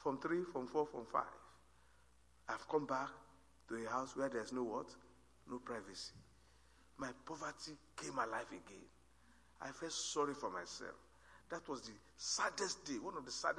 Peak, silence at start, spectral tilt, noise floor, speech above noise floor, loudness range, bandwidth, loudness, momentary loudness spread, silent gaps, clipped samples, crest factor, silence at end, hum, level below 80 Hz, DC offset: -22 dBFS; 0 s; -3 dB/octave; -71 dBFS; 27 dB; 5 LU; 11 kHz; -44 LUFS; 14 LU; none; under 0.1%; 22 dB; 0 s; 60 Hz at -75 dBFS; -74 dBFS; under 0.1%